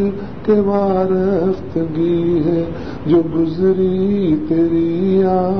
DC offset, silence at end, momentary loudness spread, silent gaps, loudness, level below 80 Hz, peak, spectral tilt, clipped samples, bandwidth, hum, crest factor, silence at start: 2%; 0 s; 6 LU; none; -16 LUFS; -40 dBFS; -2 dBFS; -10.5 dB/octave; under 0.1%; 6 kHz; none; 12 dB; 0 s